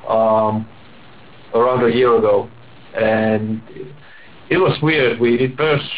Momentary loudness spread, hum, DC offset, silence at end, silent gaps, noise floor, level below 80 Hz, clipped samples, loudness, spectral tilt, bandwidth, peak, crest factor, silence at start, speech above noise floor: 17 LU; none; 0.8%; 0 s; none; -43 dBFS; -50 dBFS; under 0.1%; -16 LUFS; -10 dB/octave; 4 kHz; -6 dBFS; 12 dB; 0.05 s; 27 dB